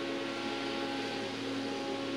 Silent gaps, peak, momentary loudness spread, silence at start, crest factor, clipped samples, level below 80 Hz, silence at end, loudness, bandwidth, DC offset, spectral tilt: none; -24 dBFS; 1 LU; 0 s; 12 dB; under 0.1%; -74 dBFS; 0 s; -36 LUFS; 14 kHz; under 0.1%; -4 dB/octave